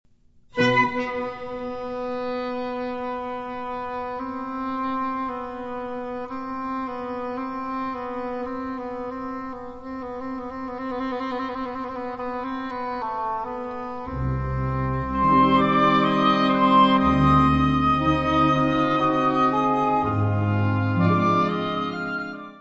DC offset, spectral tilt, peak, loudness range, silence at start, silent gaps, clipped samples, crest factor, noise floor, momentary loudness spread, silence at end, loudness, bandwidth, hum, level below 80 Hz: under 0.1%; -7.5 dB/octave; -6 dBFS; 12 LU; 0.55 s; none; under 0.1%; 18 dB; -55 dBFS; 14 LU; 0 s; -24 LUFS; 7.8 kHz; none; -42 dBFS